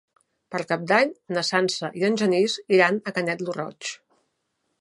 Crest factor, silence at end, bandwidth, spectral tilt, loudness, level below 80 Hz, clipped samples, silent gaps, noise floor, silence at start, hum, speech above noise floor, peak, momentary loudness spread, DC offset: 22 dB; 0.85 s; 11.5 kHz; -4.5 dB/octave; -23 LUFS; -74 dBFS; under 0.1%; none; -75 dBFS; 0.5 s; none; 52 dB; -4 dBFS; 13 LU; under 0.1%